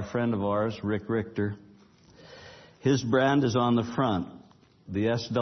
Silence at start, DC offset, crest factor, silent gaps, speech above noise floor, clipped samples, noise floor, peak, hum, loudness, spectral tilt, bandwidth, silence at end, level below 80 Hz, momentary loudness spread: 0 s; under 0.1%; 16 dB; none; 30 dB; under 0.1%; -56 dBFS; -12 dBFS; none; -27 LUFS; -6.5 dB/octave; 6.4 kHz; 0 s; -62 dBFS; 17 LU